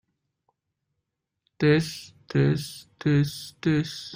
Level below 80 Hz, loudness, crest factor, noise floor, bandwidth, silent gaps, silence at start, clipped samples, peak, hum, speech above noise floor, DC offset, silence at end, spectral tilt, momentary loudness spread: -58 dBFS; -25 LUFS; 18 dB; -82 dBFS; 16 kHz; none; 1.6 s; under 0.1%; -8 dBFS; none; 57 dB; under 0.1%; 0 s; -6.5 dB/octave; 11 LU